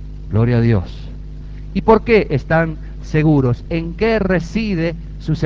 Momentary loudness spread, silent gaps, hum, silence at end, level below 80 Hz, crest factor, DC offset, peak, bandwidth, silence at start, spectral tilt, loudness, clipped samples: 17 LU; none; none; 0 s; -30 dBFS; 16 dB; 0.2%; 0 dBFS; 7.4 kHz; 0 s; -8.5 dB/octave; -17 LUFS; under 0.1%